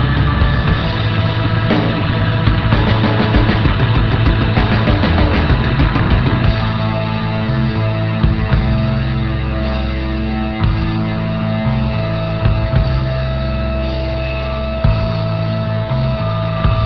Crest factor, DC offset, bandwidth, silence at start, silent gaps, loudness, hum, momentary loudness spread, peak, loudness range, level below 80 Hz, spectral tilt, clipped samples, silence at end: 14 dB; 0.9%; 6 kHz; 0 s; none; -16 LUFS; none; 5 LU; 0 dBFS; 4 LU; -20 dBFS; -9 dB/octave; under 0.1%; 0 s